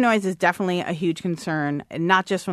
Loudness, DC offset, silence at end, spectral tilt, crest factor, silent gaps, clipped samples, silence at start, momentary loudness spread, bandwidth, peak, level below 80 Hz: -23 LUFS; under 0.1%; 0 s; -5.5 dB/octave; 20 dB; none; under 0.1%; 0 s; 6 LU; 13.5 kHz; -2 dBFS; -64 dBFS